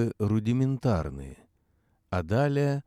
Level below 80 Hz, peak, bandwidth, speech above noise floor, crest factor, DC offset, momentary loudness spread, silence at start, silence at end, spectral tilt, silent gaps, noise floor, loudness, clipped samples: -48 dBFS; -12 dBFS; 12 kHz; 43 dB; 16 dB; under 0.1%; 12 LU; 0 s; 0.05 s; -8.5 dB/octave; none; -69 dBFS; -28 LUFS; under 0.1%